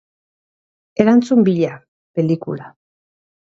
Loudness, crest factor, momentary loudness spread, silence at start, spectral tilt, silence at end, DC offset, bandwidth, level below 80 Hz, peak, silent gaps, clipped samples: -16 LUFS; 18 dB; 16 LU; 1 s; -8 dB/octave; 0.75 s; under 0.1%; 7.6 kHz; -62 dBFS; 0 dBFS; 1.88-2.14 s; under 0.1%